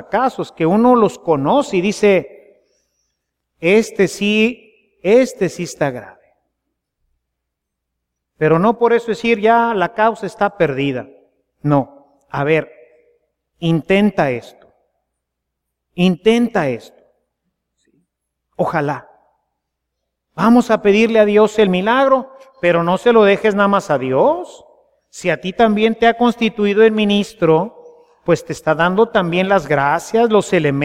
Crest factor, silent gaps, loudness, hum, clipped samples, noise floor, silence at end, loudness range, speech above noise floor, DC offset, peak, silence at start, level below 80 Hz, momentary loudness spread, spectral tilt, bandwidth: 16 dB; none; -15 LUFS; none; under 0.1%; -78 dBFS; 0 s; 7 LU; 63 dB; under 0.1%; 0 dBFS; 0 s; -52 dBFS; 10 LU; -6 dB/octave; 14.5 kHz